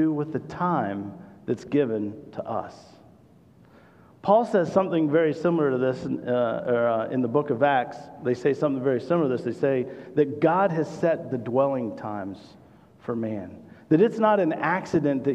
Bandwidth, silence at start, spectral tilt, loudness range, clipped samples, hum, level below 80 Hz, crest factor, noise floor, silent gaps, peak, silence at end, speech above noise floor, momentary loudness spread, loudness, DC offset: 9 kHz; 0 s; -8 dB/octave; 5 LU; under 0.1%; none; -66 dBFS; 18 dB; -54 dBFS; none; -6 dBFS; 0 s; 30 dB; 12 LU; -25 LUFS; under 0.1%